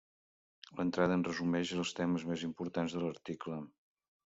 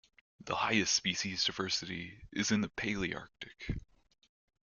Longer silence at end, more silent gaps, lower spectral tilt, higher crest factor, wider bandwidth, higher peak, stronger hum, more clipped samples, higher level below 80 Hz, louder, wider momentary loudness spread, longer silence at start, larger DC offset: second, 0.7 s vs 0.9 s; neither; first, -6 dB/octave vs -2.5 dB/octave; about the same, 20 dB vs 22 dB; second, 8 kHz vs 10 kHz; about the same, -18 dBFS vs -16 dBFS; neither; neither; second, -72 dBFS vs -56 dBFS; about the same, -36 LUFS vs -34 LUFS; about the same, 12 LU vs 14 LU; first, 0.7 s vs 0.4 s; neither